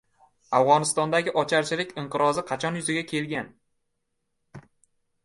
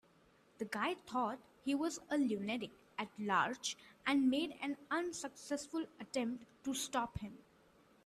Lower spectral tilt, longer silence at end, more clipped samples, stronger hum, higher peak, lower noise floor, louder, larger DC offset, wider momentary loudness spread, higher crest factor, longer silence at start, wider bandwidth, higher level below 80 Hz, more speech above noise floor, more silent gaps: about the same, -4 dB/octave vs -3.5 dB/octave; about the same, 0.65 s vs 0.7 s; neither; neither; first, -6 dBFS vs -20 dBFS; first, -76 dBFS vs -69 dBFS; first, -25 LUFS vs -39 LUFS; neither; about the same, 10 LU vs 11 LU; about the same, 22 dB vs 20 dB; about the same, 0.5 s vs 0.6 s; second, 12 kHz vs 14 kHz; about the same, -68 dBFS vs -68 dBFS; first, 52 dB vs 30 dB; neither